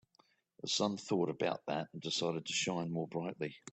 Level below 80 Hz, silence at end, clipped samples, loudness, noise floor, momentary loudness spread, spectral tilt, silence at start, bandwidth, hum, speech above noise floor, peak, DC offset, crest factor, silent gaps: -78 dBFS; 0 s; under 0.1%; -37 LUFS; -72 dBFS; 6 LU; -4 dB/octave; 0.65 s; 8.4 kHz; none; 35 dB; -18 dBFS; under 0.1%; 20 dB; none